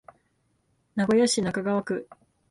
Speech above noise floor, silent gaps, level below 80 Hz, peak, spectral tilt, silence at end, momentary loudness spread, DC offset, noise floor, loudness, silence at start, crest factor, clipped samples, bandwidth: 46 dB; none; -62 dBFS; -12 dBFS; -4.5 dB/octave; 0.45 s; 12 LU; under 0.1%; -71 dBFS; -25 LUFS; 0.95 s; 16 dB; under 0.1%; 11.5 kHz